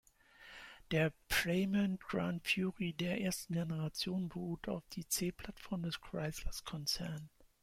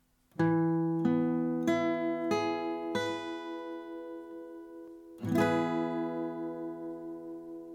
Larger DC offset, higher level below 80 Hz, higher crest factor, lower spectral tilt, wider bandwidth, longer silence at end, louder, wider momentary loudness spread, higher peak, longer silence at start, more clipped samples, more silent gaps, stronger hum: neither; first, -56 dBFS vs -72 dBFS; about the same, 18 dB vs 18 dB; second, -4.5 dB/octave vs -7 dB/octave; first, 16.5 kHz vs 14 kHz; first, 0.2 s vs 0 s; second, -38 LUFS vs -32 LUFS; second, 11 LU vs 16 LU; second, -20 dBFS vs -16 dBFS; about the same, 0.4 s vs 0.4 s; neither; neither; neither